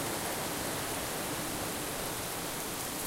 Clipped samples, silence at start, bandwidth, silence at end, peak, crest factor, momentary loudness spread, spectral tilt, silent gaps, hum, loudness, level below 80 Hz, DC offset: under 0.1%; 0 s; 16 kHz; 0 s; -20 dBFS; 16 dB; 1 LU; -2.5 dB/octave; none; none; -35 LUFS; -54 dBFS; under 0.1%